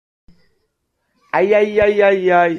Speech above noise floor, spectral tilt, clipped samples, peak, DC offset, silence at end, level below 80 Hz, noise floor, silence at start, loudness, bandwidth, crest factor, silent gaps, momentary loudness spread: 57 dB; -6.5 dB/octave; under 0.1%; -2 dBFS; under 0.1%; 0 s; -50 dBFS; -70 dBFS; 1.35 s; -14 LUFS; 7 kHz; 14 dB; none; 5 LU